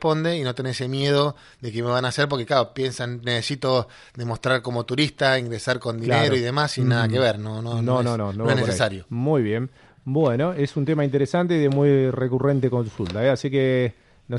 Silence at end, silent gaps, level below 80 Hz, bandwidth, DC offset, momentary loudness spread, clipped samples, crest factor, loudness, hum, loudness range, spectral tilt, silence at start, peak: 0 s; none; -56 dBFS; 11.5 kHz; under 0.1%; 8 LU; under 0.1%; 18 dB; -22 LUFS; none; 3 LU; -6 dB/octave; 0 s; -4 dBFS